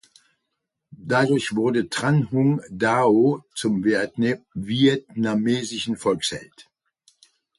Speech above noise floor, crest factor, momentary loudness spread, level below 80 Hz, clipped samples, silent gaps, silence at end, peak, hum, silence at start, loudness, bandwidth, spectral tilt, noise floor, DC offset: 58 dB; 16 dB; 8 LU; -58 dBFS; under 0.1%; none; 0.95 s; -6 dBFS; none; 0.9 s; -22 LUFS; 11.5 kHz; -5.5 dB/octave; -80 dBFS; under 0.1%